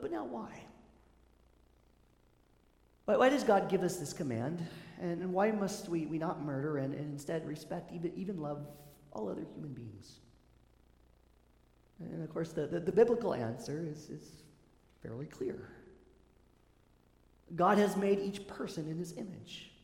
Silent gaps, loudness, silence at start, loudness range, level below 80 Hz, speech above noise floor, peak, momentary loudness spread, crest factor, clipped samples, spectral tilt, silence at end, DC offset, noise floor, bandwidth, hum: none; -35 LUFS; 0 s; 14 LU; -68 dBFS; 33 dB; -14 dBFS; 20 LU; 24 dB; under 0.1%; -6 dB/octave; 0.15 s; under 0.1%; -68 dBFS; 17 kHz; none